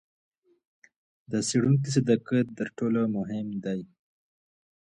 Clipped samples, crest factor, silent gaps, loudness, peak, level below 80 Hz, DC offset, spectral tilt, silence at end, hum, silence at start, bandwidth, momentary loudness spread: under 0.1%; 18 dB; none; -27 LUFS; -10 dBFS; -68 dBFS; under 0.1%; -6 dB/octave; 1 s; none; 1.3 s; 11 kHz; 9 LU